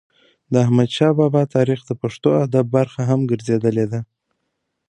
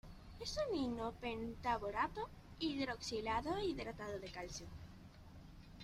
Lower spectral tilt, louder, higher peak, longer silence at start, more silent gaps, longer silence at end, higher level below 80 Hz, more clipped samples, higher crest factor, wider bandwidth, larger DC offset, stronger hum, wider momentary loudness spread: first, -8 dB/octave vs -4.5 dB/octave; first, -18 LUFS vs -43 LUFS; first, -2 dBFS vs -24 dBFS; first, 0.5 s vs 0.05 s; neither; first, 0.85 s vs 0 s; about the same, -58 dBFS vs -58 dBFS; neither; about the same, 16 dB vs 18 dB; second, 9.8 kHz vs 15.5 kHz; neither; neither; second, 7 LU vs 19 LU